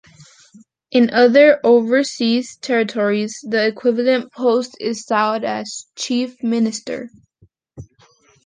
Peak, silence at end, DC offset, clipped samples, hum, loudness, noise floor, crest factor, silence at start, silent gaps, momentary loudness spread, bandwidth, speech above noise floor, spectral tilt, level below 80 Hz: -2 dBFS; 0.6 s; under 0.1%; under 0.1%; none; -17 LUFS; -56 dBFS; 16 dB; 0.9 s; none; 14 LU; 9.8 kHz; 40 dB; -4 dB/octave; -62 dBFS